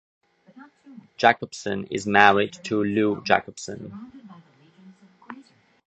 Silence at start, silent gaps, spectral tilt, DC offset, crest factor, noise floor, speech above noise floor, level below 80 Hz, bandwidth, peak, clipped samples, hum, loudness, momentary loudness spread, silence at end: 0.55 s; none; -4.5 dB/octave; under 0.1%; 26 dB; -52 dBFS; 29 dB; -62 dBFS; 9 kHz; 0 dBFS; under 0.1%; none; -21 LUFS; 27 LU; 0.45 s